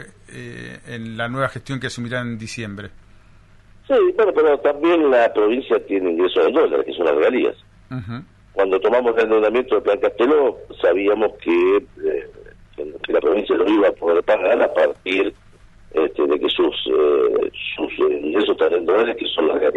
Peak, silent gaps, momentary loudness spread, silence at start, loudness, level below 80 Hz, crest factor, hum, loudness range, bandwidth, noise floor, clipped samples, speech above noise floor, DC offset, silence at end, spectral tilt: -4 dBFS; none; 14 LU; 0 s; -18 LUFS; -52 dBFS; 14 dB; none; 4 LU; 10.5 kHz; -48 dBFS; under 0.1%; 30 dB; under 0.1%; 0 s; -6 dB/octave